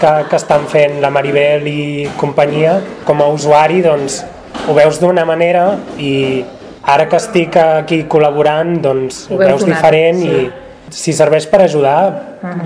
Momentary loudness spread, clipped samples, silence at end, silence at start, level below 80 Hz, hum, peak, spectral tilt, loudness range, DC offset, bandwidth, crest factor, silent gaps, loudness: 9 LU; 0.9%; 0 s; 0 s; -48 dBFS; none; 0 dBFS; -5.5 dB/octave; 1 LU; under 0.1%; 11 kHz; 12 dB; none; -12 LUFS